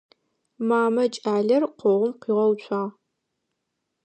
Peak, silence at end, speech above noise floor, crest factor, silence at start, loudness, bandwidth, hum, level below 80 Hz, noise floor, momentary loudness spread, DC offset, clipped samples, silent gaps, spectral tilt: -10 dBFS; 1.15 s; 57 dB; 14 dB; 0.6 s; -23 LUFS; 9 kHz; none; -80 dBFS; -79 dBFS; 8 LU; under 0.1%; under 0.1%; none; -6.5 dB/octave